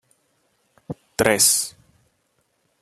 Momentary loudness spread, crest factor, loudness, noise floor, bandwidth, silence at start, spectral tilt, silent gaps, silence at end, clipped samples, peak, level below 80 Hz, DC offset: 23 LU; 26 dB; -18 LUFS; -69 dBFS; 13.5 kHz; 0.9 s; -1.5 dB/octave; none; 1.1 s; under 0.1%; 0 dBFS; -56 dBFS; under 0.1%